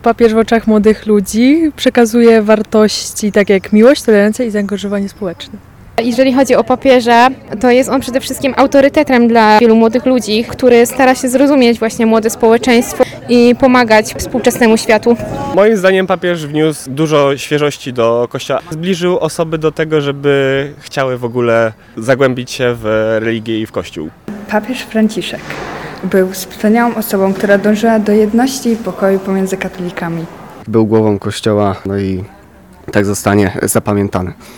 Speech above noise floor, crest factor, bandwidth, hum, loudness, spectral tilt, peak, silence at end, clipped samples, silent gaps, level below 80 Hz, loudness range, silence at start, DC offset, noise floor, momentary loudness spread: 28 dB; 12 dB; 18.5 kHz; none; -11 LUFS; -5 dB/octave; 0 dBFS; 0 s; 0.5%; none; -42 dBFS; 6 LU; 0.05 s; 0.2%; -39 dBFS; 10 LU